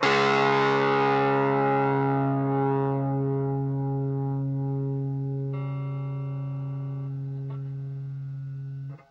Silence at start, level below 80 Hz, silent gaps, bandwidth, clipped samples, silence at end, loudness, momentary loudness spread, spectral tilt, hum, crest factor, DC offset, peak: 0 s; -64 dBFS; none; 7.6 kHz; under 0.1%; 0.15 s; -27 LUFS; 13 LU; -7.5 dB/octave; none; 18 dB; under 0.1%; -8 dBFS